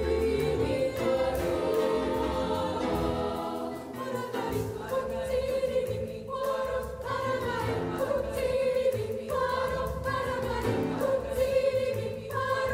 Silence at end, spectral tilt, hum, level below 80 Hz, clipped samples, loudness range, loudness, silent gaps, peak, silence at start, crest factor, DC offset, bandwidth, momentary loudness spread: 0 s; -6 dB/octave; none; -46 dBFS; under 0.1%; 3 LU; -30 LUFS; none; -14 dBFS; 0 s; 14 dB; under 0.1%; 16 kHz; 6 LU